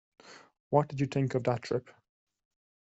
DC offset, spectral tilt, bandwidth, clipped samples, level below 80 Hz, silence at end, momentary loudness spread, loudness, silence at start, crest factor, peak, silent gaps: under 0.1%; -7.5 dB/octave; 8 kHz; under 0.1%; -68 dBFS; 1.05 s; 6 LU; -31 LUFS; 0.25 s; 24 dB; -10 dBFS; 0.60-0.71 s